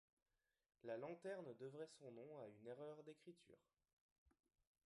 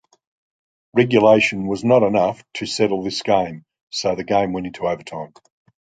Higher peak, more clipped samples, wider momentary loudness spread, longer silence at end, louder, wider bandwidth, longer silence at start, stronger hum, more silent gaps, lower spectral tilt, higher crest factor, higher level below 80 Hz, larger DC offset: second, -40 dBFS vs -2 dBFS; neither; second, 10 LU vs 15 LU; about the same, 0.6 s vs 0.6 s; second, -57 LUFS vs -19 LUFS; first, 11 kHz vs 9.4 kHz; about the same, 0.85 s vs 0.95 s; neither; first, 3.93-4.26 s vs 3.81-3.87 s; about the same, -6 dB/octave vs -5 dB/octave; about the same, 18 dB vs 18 dB; second, under -90 dBFS vs -54 dBFS; neither